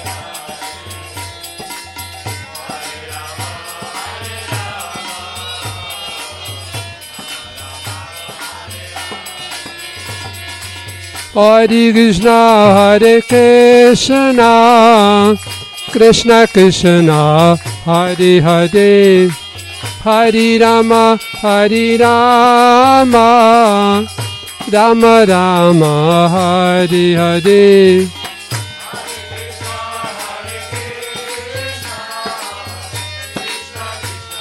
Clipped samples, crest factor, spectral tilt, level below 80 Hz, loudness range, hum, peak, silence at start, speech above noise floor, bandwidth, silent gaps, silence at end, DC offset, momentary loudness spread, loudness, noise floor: under 0.1%; 12 dB; -5 dB/octave; -44 dBFS; 18 LU; none; 0 dBFS; 0 s; 21 dB; 16.5 kHz; none; 0 s; under 0.1%; 19 LU; -8 LUFS; -29 dBFS